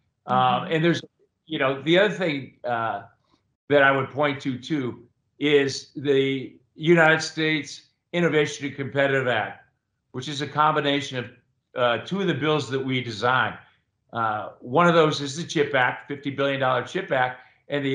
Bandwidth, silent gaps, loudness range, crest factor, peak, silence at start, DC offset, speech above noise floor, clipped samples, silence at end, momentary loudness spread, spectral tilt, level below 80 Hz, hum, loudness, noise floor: 10.5 kHz; 3.55-3.68 s; 3 LU; 20 dB; -4 dBFS; 0.25 s; under 0.1%; 47 dB; under 0.1%; 0 s; 13 LU; -5 dB/octave; -70 dBFS; none; -23 LUFS; -70 dBFS